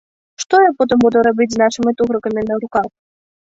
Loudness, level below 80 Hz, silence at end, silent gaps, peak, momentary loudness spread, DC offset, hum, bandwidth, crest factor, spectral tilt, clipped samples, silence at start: -15 LUFS; -52 dBFS; 0.6 s; none; -2 dBFS; 8 LU; under 0.1%; none; 8 kHz; 14 dB; -4.5 dB/octave; under 0.1%; 0.4 s